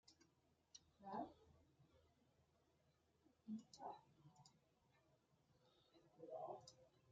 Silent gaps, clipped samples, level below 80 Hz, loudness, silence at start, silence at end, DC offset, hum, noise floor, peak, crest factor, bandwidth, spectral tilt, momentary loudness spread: none; under 0.1%; under -90 dBFS; -57 LUFS; 0.05 s; 0 s; under 0.1%; none; -82 dBFS; -38 dBFS; 24 dB; 7.4 kHz; -5 dB/octave; 14 LU